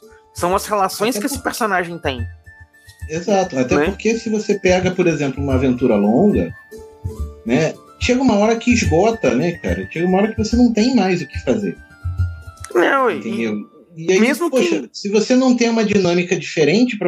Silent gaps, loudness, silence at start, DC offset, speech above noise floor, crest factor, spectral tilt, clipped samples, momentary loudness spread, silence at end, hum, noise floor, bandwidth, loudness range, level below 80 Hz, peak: none; -17 LUFS; 0.35 s; under 0.1%; 28 dB; 14 dB; -5.5 dB/octave; under 0.1%; 13 LU; 0 s; none; -44 dBFS; 15.5 kHz; 4 LU; -38 dBFS; -2 dBFS